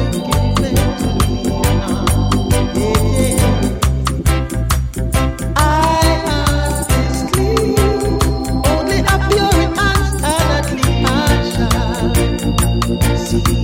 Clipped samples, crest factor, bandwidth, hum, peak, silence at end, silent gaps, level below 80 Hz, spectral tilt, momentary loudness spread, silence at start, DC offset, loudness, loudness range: under 0.1%; 14 dB; 17 kHz; none; 0 dBFS; 0 s; none; -20 dBFS; -5 dB/octave; 3 LU; 0 s; under 0.1%; -15 LUFS; 1 LU